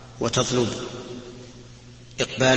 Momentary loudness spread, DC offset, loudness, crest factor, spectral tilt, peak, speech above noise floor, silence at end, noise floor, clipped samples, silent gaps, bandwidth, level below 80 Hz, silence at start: 23 LU; under 0.1%; -25 LUFS; 20 dB; -4 dB/octave; -4 dBFS; 23 dB; 0 s; -45 dBFS; under 0.1%; none; 8.8 kHz; -50 dBFS; 0 s